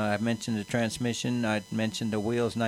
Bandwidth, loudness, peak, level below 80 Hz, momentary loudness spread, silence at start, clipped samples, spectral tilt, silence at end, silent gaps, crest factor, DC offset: 15 kHz; -29 LUFS; -14 dBFS; -60 dBFS; 2 LU; 0 s; under 0.1%; -5 dB/octave; 0 s; none; 14 dB; under 0.1%